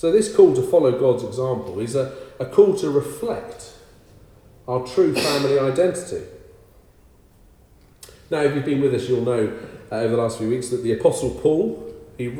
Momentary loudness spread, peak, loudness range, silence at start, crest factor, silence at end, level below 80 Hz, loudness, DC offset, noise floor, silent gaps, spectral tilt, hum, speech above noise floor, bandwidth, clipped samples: 15 LU; -2 dBFS; 5 LU; 0.05 s; 20 dB; 0 s; -52 dBFS; -21 LUFS; under 0.1%; -52 dBFS; none; -6 dB/octave; none; 33 dB; 15.5 kHz; under 0.1%